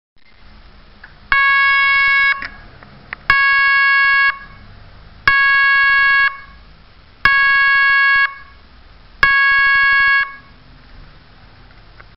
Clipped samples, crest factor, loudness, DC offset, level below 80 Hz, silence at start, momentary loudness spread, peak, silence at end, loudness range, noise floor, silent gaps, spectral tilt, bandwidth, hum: under 0.1%; 16 dB; -12 LUFS; 0.4%; -42 dBFS; 1.3 s; 7 LU; 0 dBFS; 1.15 s; 3 LU; -45 dBFS; none; 3 dB/octave; 5.8 kHz; none